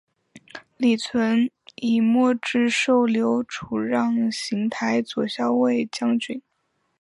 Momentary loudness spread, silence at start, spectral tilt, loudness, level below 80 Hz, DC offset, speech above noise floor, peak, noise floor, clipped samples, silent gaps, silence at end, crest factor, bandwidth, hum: 9 LU; 0.35 s; -4.5 dB/octave; -22 LUFS; -66 dBFS; under 0.1%; 50 dB; -8 dBFS; -72 dBFS; under 0.1%; none; 0.6 s; 14 dB; 11 kHz; none